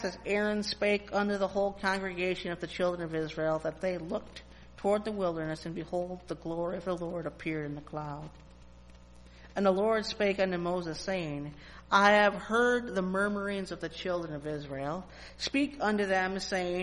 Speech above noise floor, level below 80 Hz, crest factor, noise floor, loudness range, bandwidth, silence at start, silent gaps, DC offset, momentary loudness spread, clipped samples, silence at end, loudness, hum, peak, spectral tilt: 22 dB; -56 dBFS; 22 dB; -53 dBFS; 8 LU; 11.5 kHz; 0 s; none; under 0.1%; 12 LU; under 0.1%; 0 s; -31 LUFS; 60 Hz at -55 dBFS; -10 dBFS; -5 dB/octave